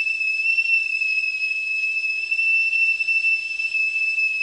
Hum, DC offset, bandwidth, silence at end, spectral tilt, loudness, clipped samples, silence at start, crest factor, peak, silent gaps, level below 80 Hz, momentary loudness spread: none; under 0.1%; 11.5 kHz; 0 s; 2.5 dB/octave; -19 LUFS; under 0.1%; 0 s; 10 dB; -10 dBFS; none; -64 dBFS; 4 LU